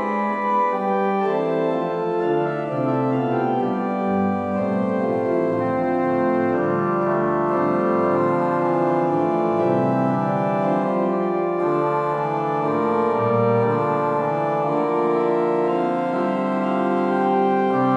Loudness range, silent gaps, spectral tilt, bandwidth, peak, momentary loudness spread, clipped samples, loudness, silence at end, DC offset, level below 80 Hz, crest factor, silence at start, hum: 2 LU; none; -9 dB/octave; 8.2 kHz; -6 dBFS; 3 LU; under 0.1%; -21 LUFS; 0 s; under 0.1%; -62 dBFS; 14 dB; 0 s; none